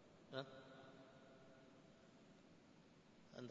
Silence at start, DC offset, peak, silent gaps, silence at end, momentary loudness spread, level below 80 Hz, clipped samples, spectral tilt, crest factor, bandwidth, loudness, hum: 0 s; under 0.1%; -32 dBFS; none; 0 s; 15 LU; -86 dBFS; under 0.1%; -4 dB/octave; 28 dB; 7.4 kHz; -61 LUFS; none